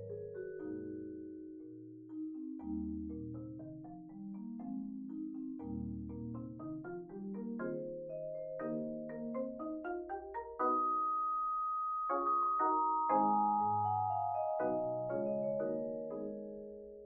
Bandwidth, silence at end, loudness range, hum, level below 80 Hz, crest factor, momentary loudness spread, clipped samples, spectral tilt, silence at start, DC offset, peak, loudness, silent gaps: 3.1 kHz; 0 s; 11 LU; none; -64 dBFS; 18 dB; 15 LU; under 0.1%; -4 dB/octave; 0 s; under 0.1%; -22 dBFS; -38 LUFS; none